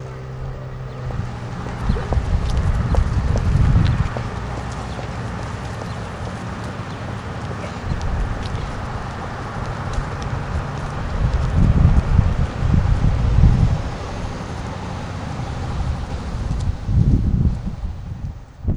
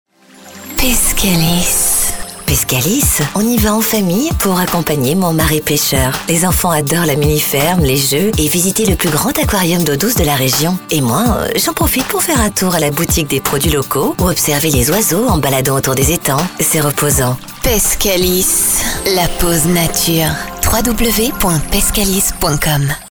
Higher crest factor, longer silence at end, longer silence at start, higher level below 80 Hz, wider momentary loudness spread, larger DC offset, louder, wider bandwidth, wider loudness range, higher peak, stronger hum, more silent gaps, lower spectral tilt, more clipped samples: first, 20 dB vs 12 dB; about the same, 0 s vs 0 s; second, 0 s vs 0.35 s; about the same, -24 dBFS vs -24 dBFS; first, 12 LU vs 3 LU; second, under 0.1% vs 0.6%; second, -23 LUFS vs -12 LUFS; second, 10.5 kHz vs over 20 kHz; first, 9 LU vs 1 LU; about the same, 0 dBFS vs -2 dBFS; neither; neither; first, -7.5 dB/octave vs -3.5 dB/octave; neither